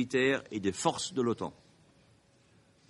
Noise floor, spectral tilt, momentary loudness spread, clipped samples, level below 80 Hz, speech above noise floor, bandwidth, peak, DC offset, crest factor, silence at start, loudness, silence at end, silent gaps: -65 dBFS; -4 dB/octave; 8 LU; under 0.1%; -72 dBFS; 33 dB; 11.5 kHz; -12 dBFS; under 0.1%; 22 dB; 0 s; -32 LUFS; 1.35 s; none